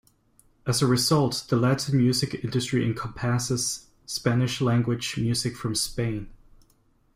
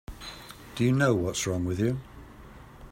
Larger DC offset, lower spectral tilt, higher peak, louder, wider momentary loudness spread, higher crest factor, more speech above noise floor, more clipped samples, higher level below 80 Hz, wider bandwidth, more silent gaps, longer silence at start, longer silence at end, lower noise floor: neither; about the same, -5 dB/octave vs -5.5 dB/octave; about the same, -8 dBFS vs -10 dBFS; about the same, -25 LUFS vs -27 LUFS; second, 8 LU vs 25 LU; about the same, 18 dB vs 20 dB; first, 39 dB vs 22 dB; neither; about the same, -52 dBFS vs -50 dBFS; about the same, 16 kHz vs 16 kHz; neither; first, 0.65 s vs 0.1 s; first, 0.8 s vs 0 s; first, -63 dBFS vs -48 dBFS